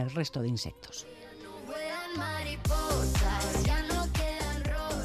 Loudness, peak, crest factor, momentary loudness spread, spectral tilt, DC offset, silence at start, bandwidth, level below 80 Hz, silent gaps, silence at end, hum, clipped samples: -32 LUFS; -18 dBFS; 14 dB; 14 LU; -4.5 dB/octave; under 0.1%; 0 s; 14.5 kHz; -36 dBFS; none; 0 s; none; under 0.1%